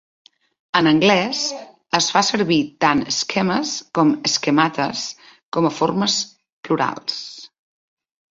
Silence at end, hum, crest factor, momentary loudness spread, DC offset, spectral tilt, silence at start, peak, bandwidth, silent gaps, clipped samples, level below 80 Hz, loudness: 0.85 s; none; 18 dB; 11 LU; under 0.1%; -3.5 dB/octave; 0.75 s; -2 dBFS; 7.8 kHz; 5.43-5.52 s, 6.52-6.63 s; under 0.1%; -60 dBFS; -19 LUFS